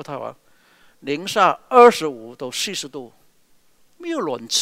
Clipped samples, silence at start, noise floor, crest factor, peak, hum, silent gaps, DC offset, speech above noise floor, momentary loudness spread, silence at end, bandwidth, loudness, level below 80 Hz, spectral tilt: under 0.1%; 0 s; -56 dBFS; 20 dB; 0 dBFS; none; none; under 0.1%; 37 dB; 23 LU; 0 s; 16 kHz; -18 LUFS; -68 dBFS; -2.5 dB/octave